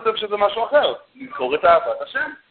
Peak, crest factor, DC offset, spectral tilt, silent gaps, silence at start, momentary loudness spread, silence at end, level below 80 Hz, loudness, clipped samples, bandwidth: -2 dBFS; 18 dB; under 0.1%; -8 dB/octave; none; 0 s; 11 LU; 0.15 s; -56 dBFS; -19 LUFS; under 0.1%; 4.5 kHz